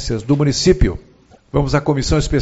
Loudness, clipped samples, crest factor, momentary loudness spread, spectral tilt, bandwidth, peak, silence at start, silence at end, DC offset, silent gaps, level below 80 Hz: -17 LUFS; under 0.1%; 16 dB; 7 LU; -5.5 dB/octave; 8.2 kHz; 0 dBFS; 0 s; 0 s; under 0.1%; none; -24 dBFS